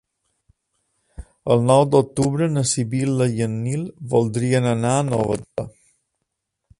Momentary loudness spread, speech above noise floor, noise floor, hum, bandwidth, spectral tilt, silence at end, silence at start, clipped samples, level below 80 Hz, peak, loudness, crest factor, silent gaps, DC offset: 12 LU; 59 dB; -78 dBFS; none; 11.5 kHz; -6 dB/octave; 1.1 s; 1.2 s; under 0.1%; -50 dBFS; -2 dBFS; -20 LUFS; 20 dB; none; under 0.1%